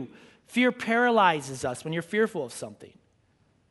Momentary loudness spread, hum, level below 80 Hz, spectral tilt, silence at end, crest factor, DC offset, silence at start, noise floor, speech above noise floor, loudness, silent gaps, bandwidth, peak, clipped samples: 17 LU; none; -68 dBFS; -4.5 dB/octave; 0.85 s; 20 dB; under 0.1%; 0 s; -66 dBFS; 39 dB; -26 LUFS; none; 11.5 kHz; -8 dBFS; under 0.1%